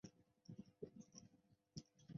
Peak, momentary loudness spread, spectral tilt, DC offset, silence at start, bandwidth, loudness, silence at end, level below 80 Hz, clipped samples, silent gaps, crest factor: -40 dBFS; 6 LU; -7 dB/octave; under 0.1%; 0.05 s; 7 kHz; -61 LUFS; 0 s; -84 dBFS; under 0.1%; none; 22 dB